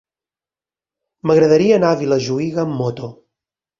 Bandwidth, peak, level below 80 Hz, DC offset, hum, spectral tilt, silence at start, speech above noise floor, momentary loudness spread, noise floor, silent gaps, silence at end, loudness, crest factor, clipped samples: 7.4 kHz; -2 dBFS; -56 dBFS; under 0.1%; none; -6.5 dB/octave; 1.25 s; over 75 dB; 13 LU; under -90 dBFS; none; 0.7 s; -16 LUFS; 16 dB; under 0.1%